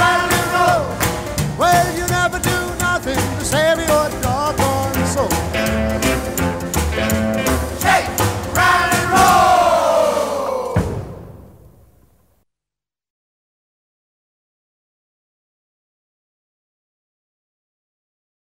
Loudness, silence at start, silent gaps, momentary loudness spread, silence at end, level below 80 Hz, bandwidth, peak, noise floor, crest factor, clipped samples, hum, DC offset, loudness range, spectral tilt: -16 LUFS; 0 s; none; 7 LU; 7 s; -34 dBFS; 16.5 kHz; -2 dBFS; -89 dBFS; 16 dB; under 0.1%; none; 0.2%; 7 LU; -4 dB/octave